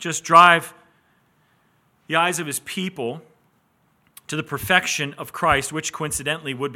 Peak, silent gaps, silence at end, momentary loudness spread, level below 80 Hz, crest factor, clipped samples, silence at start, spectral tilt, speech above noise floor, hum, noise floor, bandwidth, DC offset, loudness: 0 dBFS; none; 0 s; 17 LU; -54 dBFS; 22 dB; under 0.1%; 0 s; -3 dB/octave; 43 dB; none; -64 dBFS; 17 kHz; under 0.1%; -20 LUFS